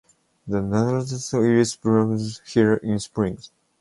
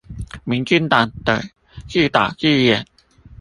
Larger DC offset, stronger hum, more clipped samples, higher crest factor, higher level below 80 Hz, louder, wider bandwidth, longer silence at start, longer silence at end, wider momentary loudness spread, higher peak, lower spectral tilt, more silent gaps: neither; neither; neither; about the same, 18 dB vs 18 dB; second, -52 dBFS vs -42 dBFS; second, -22 LUFS vs -17 LUFS; about the same, 11.5 kHz vs 11.5 kHz; first, 0.45 s vs 0.1 s; first, 0.35 s vs 0.05 s; second, 8 LU vs 12 LU; second, -4 dBFS vs 0 dBFS; about the same, -6 dB/octave vs -5.5 dB/octave; neither